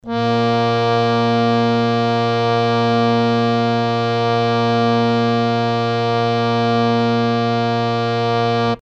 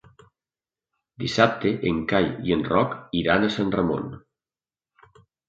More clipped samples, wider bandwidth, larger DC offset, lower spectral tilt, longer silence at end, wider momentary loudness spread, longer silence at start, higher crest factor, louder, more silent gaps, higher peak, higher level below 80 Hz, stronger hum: neither; about the same, 8.2 kHz vs 7.8 kHz; neither; about the same, -7 dB/octave vs -6 dB/octave; second, 0.05 s vs 1.3 s; second, 2 LU vs 7 LU; second, 0.05 s vs 1.2 s; second, 14 dB vs 22 dB; first, -17 LUFS vs -23 LUFS; neither; about the same, -4 dBFS vs -4 dBFS; about the same, -50 dBFS vs -50 dBFS; neither